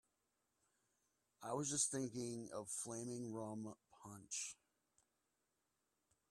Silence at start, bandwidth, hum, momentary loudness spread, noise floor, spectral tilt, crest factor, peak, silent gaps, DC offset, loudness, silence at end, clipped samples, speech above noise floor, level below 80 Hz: 1.4 s; 15 kHz; none; 18 LU; -88 dBFS; -3.5 dB/octave; 24 dB; -24 dBFS; none; under 0.1%; -45 LUFS; 1.75 s; under 0.1%; 41 dB; -84 dBFS